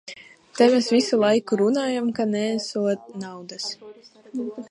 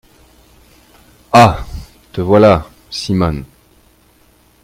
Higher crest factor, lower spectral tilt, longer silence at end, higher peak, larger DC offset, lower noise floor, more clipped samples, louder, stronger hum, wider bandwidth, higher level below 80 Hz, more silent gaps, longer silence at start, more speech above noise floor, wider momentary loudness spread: about the same, 18 dB vs 16 dB; second, -4.5 dB/octave vs -6.5 dB/octave; second, 0.05 s vs 1.25 s; second, -4 dBFS vs 0 dBFS; neither; second, -43 dBFS vs -51 dBFS; second, under 0.1% vs 0.2%; second, -22 LUFS vs -12 LUFS; neither; second, 11.5 kHz vs 16.5 kHz; second, -74 dBFS vs -36 dBFS; neither; second, 0.05 s vs 1.35 s; second, 21 dB vs 40 dB; about the same, 17 LU vs 19 LU